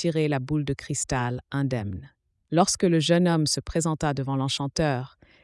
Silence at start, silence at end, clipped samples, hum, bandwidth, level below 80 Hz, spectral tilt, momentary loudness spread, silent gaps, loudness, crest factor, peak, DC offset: 0 s; 0.35 s; under 0.1%; none; 12 kHz; -50 dBFS; -5 dB/octave; 9 LU; none; -25 LUFS; 18 dB; -6 dBFS; under 0.1%